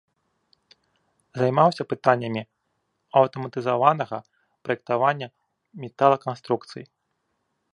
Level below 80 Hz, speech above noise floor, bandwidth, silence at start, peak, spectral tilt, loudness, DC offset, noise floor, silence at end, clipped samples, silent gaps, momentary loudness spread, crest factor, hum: -72 dBFS; 52 dB; 10.5 kHz; 1.35 s; -2 dBFS; -7 dB/octave; -23 LUFS; under 0.1%; -75 dBFS; 0.9 s; under 0.1%; none; 18 LU; 24 dB; none